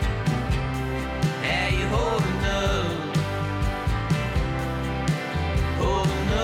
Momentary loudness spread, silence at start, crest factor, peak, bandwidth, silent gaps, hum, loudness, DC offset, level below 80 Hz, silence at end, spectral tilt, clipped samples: 4 LU; 0 s; 12 dB; -12 dBFS; 16 kHz; none; none; -25 LUFS; under 0.1%; -32 dBFS; 0 s; -6 dB/octave; under 0.1%